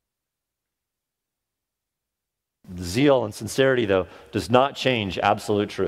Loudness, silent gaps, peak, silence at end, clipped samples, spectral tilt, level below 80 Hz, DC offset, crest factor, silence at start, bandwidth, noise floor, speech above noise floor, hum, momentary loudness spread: -22 LUFS; none; -2 dBFS; 0 s; under 0.1%; -5 dB/octave; -54 dBFS; under 0.1%; 22 dB; 2.7 s; 16 kHz; -85 dBFS; 63 dB; none; 11 LU